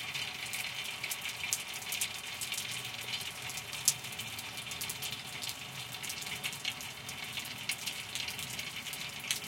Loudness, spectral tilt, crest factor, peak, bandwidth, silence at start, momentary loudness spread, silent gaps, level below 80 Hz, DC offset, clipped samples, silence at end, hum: -37 LUFS; 0 dB/octave; 34 dB; -6 dBFS; 17 kHz; 0 s; 5 LU; none; -70 dBFS; under 0.1%; under 0.1%; 0 s; none